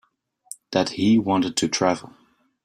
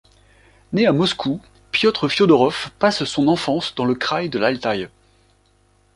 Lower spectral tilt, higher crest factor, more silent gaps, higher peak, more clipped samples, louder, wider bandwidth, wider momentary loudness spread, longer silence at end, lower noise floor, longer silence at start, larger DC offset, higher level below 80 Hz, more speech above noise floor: about the same, -4.5 dB/octave vs -5.5 dB/octave; about the same, 18 dB vs 18 dB; neither; about the same, -4 dBFS vs -2 dBFS; neither; second, -22 LUFS vs -19 LUFS; first, 13.5 kHz vs 11.5 kHz; first, 14 LU vs 10 LU; second, 0.6 s vs 1.1 s; second, -45 dBFS vs -58 dBFS; about the same, 0.7 s vs 0.7 s; neither; second, -60 dBFS vs -54 dBFS; second, 24 dB vs 40 dB